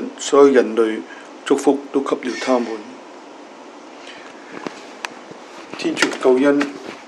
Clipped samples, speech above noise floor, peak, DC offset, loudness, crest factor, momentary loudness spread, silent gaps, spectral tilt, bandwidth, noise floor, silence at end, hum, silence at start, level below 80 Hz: under 0.1%; 22 dB; 0 dBFS; under 0.1%; -17 LUFS; 20 dB; 25 LU; none; -3.5 dB/octave; 12 kHz; -39 dBFS; 0 s; none; 0 s; -78 dBFS